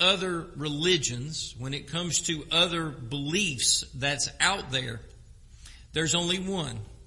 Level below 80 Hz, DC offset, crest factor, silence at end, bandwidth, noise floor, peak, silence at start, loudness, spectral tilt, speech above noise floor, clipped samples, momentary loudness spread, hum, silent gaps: -50 dBFS; under 0.1%; 20 dB; 0.05 s; 11.5 kHz; -50 dBFS; -8 dBFS; 0 s; -27 LUFS; -2.5 dB/octave; 21 dB; under 0.1%; 10 LU; none; none